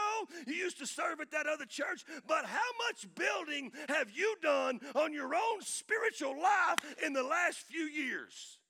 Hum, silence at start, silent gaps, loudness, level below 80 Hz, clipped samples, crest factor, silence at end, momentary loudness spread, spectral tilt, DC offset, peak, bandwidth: none; 0 s; none; -35 LUFS; under -90 dBFS; under 0.1%; 24 dB; 0.15 s; 7 LU; -1 dB/octave; under 0.1%; -12 dBFS; 18 kHz